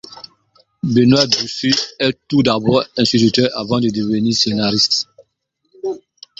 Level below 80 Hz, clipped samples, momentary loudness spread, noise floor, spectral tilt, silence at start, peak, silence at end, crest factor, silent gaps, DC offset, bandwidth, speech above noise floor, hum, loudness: -50 dBFS; under 0.1%; 14 LU; -69 dBFS; -4.5 dB/octave; 0.15 s; 0 dBFS; 0.45 s; 16 dB; none; under 0.1%; 7.8 kHz; 53 dB; none; -15 LUFS